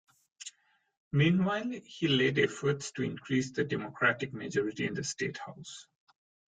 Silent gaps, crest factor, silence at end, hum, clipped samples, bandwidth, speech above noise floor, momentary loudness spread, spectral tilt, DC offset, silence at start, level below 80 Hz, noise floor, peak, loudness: 0.97-1.11 s; 20 dB; 0.65 s; none; under 0.1%; 9.4 kHz; 32 dB; 20 LU; -5 dB/octave; under 0.1%; 0.4 s; -68 dBFS; -63 dBFS; -14 dBFS; -31 LUFS